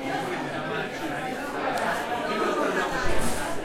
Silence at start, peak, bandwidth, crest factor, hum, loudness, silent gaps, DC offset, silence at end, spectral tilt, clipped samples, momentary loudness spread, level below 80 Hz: 0 s; -10 dBFS; 16.5 kHz; 16 dB; none; -28 LUFS; none; under 0.1%; 0 s; -4 dB/octave; under 0.1%; 5 LU; -42 dBFS